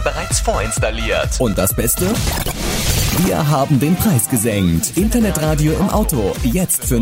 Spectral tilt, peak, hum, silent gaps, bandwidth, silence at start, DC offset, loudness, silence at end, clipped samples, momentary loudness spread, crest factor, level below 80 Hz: -4.5 dB/octave; -4 dBFS; none; none; 16.5 kHz; 0 s; under 0.1%; -16 LUFS; 0 s; under 0.1%; 4 LU; 12 dB; -24 dBFS